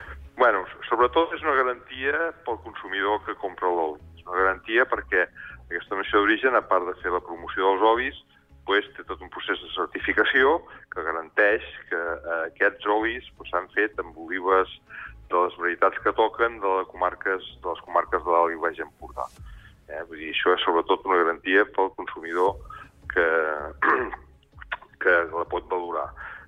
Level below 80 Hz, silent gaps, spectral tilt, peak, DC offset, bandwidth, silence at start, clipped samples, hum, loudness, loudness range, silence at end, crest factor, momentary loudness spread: -52 dBFS; none; -6 dB/octave; -8 dBFS; under 0.1%; 6.6 kHz; 0 s; under 0.1%; none; -24 LUFS; 3 LU; 0 s; 16 dB; 14 LU